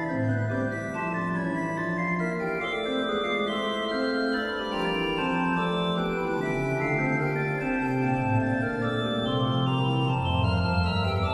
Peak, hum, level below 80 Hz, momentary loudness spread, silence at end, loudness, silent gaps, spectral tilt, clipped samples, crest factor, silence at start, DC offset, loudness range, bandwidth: -14 dBFS; none; -46 dBFS; 3 LU; 0 s; -27 LUFS; none; -7 dB/octave; under 0.1%; 14 dB; 0 s; under 0.1%; 2 LU; 12 kHz